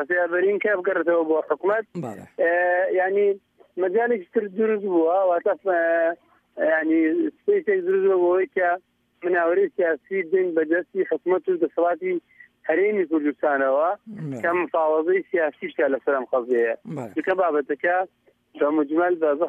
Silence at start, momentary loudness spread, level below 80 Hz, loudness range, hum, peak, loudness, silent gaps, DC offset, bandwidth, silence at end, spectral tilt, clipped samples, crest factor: 0 s; 7 LU; -78 dBFS; 2 LU; none; -8 dBFS; -22 LUFS; none; under 0.1%; 3.7 kHz; 0 s; -8 dB/octave; under 0.1%; 14 dB